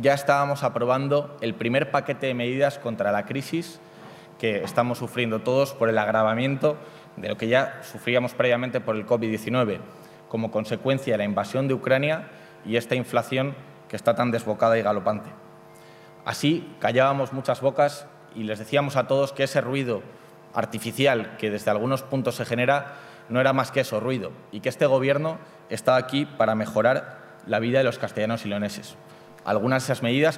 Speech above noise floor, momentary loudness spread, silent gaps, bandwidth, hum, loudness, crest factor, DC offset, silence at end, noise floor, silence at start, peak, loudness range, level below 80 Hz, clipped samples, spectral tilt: 24 dB; 12 LU; none; 16 kHz; none; -25 LUFS; 20 dB; under 0.1%; 0 s; -48 dBFS; 0 s; -4 dBFS; 2 LU; -70 dBFS; under 0.1%; -6 dB/octave